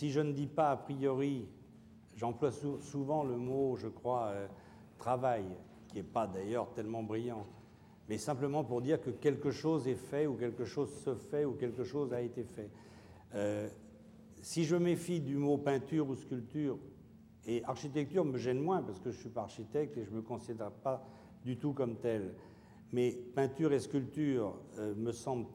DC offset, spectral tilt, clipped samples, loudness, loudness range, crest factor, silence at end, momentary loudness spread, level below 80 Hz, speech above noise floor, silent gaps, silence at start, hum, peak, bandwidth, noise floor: under 0.1%; -7 dB/octave; under 0.1%; -37 LUFS; 4 LU; 16 dB; 0 s; 13 LU; -72 dBFS; 22 dB; none; 0 s; none; -20 dBFS; 16.5 kHz; -59 dBFS